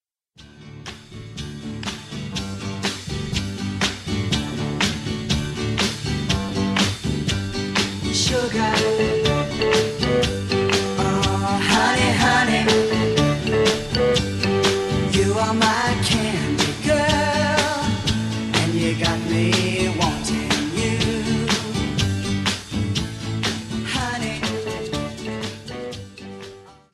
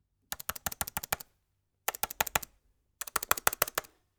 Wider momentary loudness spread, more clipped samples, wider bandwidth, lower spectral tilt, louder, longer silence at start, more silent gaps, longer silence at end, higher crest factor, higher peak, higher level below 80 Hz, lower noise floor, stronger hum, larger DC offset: about the same, 11 LU vs 13 LU; neither; second, 14 kHz vs over 20 kHz; first, -4.5 dB/octave vs -0.5 dB/octave; first, -21 LUFS vs -33 LUFS; about the same, 0.4 s vs 0.3 s; neither; second, 0.2 s vs 0.35 s; second, 18 dB vs 36 dB; about the same, -4 dBFS vs -2 dBFS; first, -38 dBFS vs -58 dBFS; second, -49 dBFS vs -78 dBFS; neither; neither